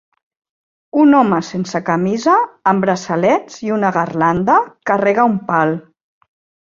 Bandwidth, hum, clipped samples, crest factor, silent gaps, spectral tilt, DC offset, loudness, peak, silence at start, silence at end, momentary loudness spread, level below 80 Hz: 7.6 kHz; none; under 0.1%; 14 dB; none; -6.5 dB/octave; under 0.1%; -15 LUFS; -2 dBFS; 0.95 s; 0.85 s; 7 LU; -56 dBFS